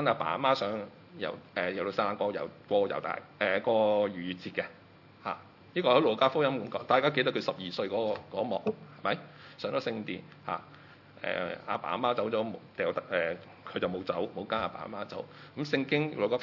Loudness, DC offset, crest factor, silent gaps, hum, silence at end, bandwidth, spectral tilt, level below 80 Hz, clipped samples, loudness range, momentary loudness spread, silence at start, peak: -32 LUFS; under 0.1%; 22 dB; none; none; 0 s; 6 kHz; -6.5 dB/octave; -76 dBFS; under 0.1%; 6 LU; 13 LU; 0 s; -10 dBFS